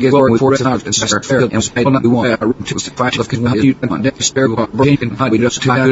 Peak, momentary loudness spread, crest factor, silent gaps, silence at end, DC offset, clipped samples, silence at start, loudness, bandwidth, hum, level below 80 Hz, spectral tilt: 0 dBFS; 5 LU; 14 dB; none; 0 s; under 0.1%; under 0.1%; 0 s; -14 LUFS; 8 kHz; none; -44 dBFS; -5 dB/octave